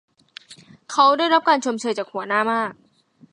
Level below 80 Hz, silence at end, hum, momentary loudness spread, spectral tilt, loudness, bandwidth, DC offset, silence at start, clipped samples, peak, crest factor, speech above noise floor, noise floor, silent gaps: -78 dBFS; 0.6 s; none; 11 LU; -3 dB/octave; -20 LUFS; 11 kHz; under 0.1%; 0.5 s; under 0.1%; -4 dBFS; 18 dB; 35 dB; -55 dBFS; none